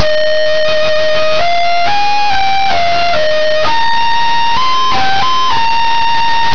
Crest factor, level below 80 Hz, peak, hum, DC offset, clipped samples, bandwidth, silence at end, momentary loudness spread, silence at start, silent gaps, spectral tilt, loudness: 10 dB; -40 dBFS; 0 dBFS; none; 30%; under 0.1%; 5.4 kHz; 0 s; 0 LU; 0 s; none; -2.5 dB/octave; -12 LUFS